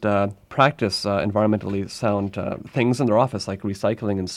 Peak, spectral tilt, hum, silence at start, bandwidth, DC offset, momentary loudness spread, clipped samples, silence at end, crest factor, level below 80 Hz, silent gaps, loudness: -2 dBFS; -6 dB/octave; none; 0 s; 13 kHz; under 0.1%; 8 LU; under 0.1%; 0 s; 20 dB; -56 dBFS; none; -22 LUFS